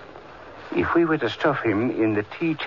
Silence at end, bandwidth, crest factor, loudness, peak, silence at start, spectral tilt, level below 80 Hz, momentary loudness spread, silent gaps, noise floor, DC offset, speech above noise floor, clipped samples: 0 s; 7 kHz; 14 dB; -23 LUFS; -10 dBFS; 0 s; -7.5 dB/octave; -54 dBFS; 21 LU; none; -42 dBFS; 0.2%; 20 dB; under 0.1%